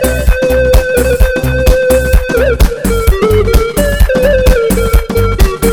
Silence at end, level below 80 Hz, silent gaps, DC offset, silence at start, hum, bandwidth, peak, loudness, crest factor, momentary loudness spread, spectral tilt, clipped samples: 0 s; -12 dBFS; none; 0.9%; 0 s; none; 17.5 kHz; 0 dBFS; -10 LUFS; 8 dB; 3 LU; -5.5 dB/octave; 0.3%